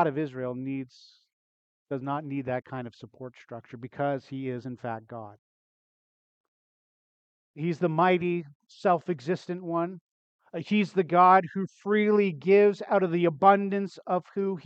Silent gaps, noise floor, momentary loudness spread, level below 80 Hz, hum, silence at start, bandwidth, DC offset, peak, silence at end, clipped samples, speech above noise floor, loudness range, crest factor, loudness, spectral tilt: 1.33-1.86 s, 5.39-7.54 s, 8.55-8.60 s, 10.01-10.39 s; under -90 dBFS; 21 LU; -76 dBFS; none; 0 s; 7.8 kHz; under 0.1%; -6 dBFS; 0.05 s; under 0.1%; over 63 dB; 14 LU; 22 dB; -26 LUFS; -8 dB/octave